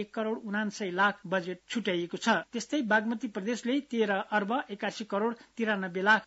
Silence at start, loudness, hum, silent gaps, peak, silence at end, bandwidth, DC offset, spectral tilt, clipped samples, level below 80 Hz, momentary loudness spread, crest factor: 0 s; -31 LUFS; none; none; -12 dBFS; 0 s; 8 kHz; under 0.1%; -3 dB/octave; under 0.1%; -76 dBFS; 7 LU; 18 dB